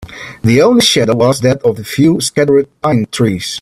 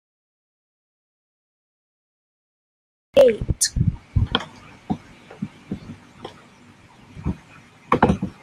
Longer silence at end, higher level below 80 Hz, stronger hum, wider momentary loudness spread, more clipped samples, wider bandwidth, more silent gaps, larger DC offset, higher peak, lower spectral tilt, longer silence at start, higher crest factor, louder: about the same, 0 s vs 0.1 s; second, -44 dBFS vs -38 dBFS; neither; second, 7 LU vs 23 LU; neither; first, 15.5 kHz vs 13.5 kHz; neither; neither; about the same, 0 dBFS vs -2 dBFS; about the same, -5 dB/octave vs -5 dB/octave; second, 0 s vs 3.15 s; second, 12 dB vs 24 dB; first, -11 LUFS vs -21 LUFS